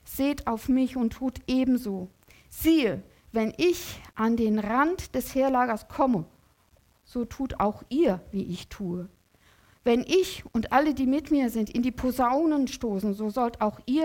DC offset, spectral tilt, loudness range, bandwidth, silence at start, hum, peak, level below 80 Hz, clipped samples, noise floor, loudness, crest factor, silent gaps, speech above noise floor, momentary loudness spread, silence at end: under 0.1%; -5.5 dB/octave; 4 LU; 17 kHz; 0.05 s; none; -8 dBFS; -50 dBFS; under 0.1%; -63 dBFS; -27 LUFS; 18 dB; none; 37 dB; 11 LU; 0 s